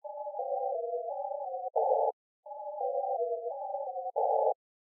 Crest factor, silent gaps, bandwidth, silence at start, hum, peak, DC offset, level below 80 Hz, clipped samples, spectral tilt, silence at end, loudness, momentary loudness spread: 18 dB; 2.13-2.43 s; 1 kHz; 0.05 s; none; -16 dBFS; under 0.1%; under -90 dBFS; under 0.1%; 21.5 dB/octave; 0.45 s; -33 LUFS; 12 LU